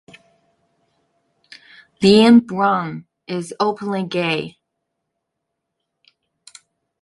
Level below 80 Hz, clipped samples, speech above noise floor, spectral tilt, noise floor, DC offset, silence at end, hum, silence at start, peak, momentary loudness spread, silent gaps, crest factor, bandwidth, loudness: -62 dBFS; under 0.1%; 62 dB; -6 dB/octave; -78 dBFS; under 0.1%; 2.55 s; none; 2 s; -2 dBFS; 18 LU; none; 20 dB; 11.5 kHz; -17 LUFS